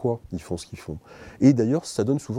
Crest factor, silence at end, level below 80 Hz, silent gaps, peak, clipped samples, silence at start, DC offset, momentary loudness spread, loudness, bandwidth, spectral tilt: 20 dB; 0 s; -54 dBFS; none; -4 dBFS; under 0.1%; 0 s; under 0.1%; 19 LU; -23 LUFS; 12.5 kHz; -7 dB/octave